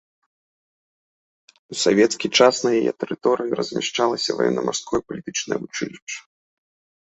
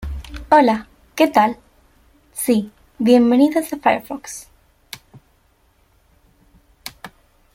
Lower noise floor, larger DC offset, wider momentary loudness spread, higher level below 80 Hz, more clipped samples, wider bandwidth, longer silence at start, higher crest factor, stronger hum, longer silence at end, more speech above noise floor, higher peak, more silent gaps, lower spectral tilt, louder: first, under -90 dBFS vs -58 dBFS; neither; second, 13 LU vs 23 LU; second, -62 dBFS vs -42 dBFS; neither; second, 8.4 kHz vs 16.5 kHz; first, 1.7 s vs 0 s; about the same, 22 dB vs 18 dB; neither; first, 0.9 s vs 0.45 s; first, over 69 dB vs 43 dB; about the same, -2 dBFS vs -2 dBFS; first, 6.02-6.07 s vs none; second, -3.5 dB/octave vs -5 dB/octave; second, -21 LUFS vs -17 LUFS